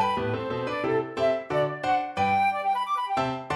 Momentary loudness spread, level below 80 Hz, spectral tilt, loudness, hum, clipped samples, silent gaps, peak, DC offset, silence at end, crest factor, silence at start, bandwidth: 5 LU; -58 dBFS; -6 dB/octave; -26 LUFS; none; under 0.1%; none; -12 dBFS; under 0.1%; 0 s; 14 dB; 0 s; 13 kHz